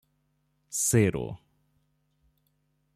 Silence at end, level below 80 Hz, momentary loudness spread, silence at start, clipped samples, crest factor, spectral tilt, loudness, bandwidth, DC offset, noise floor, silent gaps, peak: 1.6 s; -58 dBFS; 17 LU; 0.7 s; under 0.1%; 22 dB; -5 dB/octave; -26 LUFS; 15 kHz; under 0.1%; -73 dBFS; none; -10 dBFS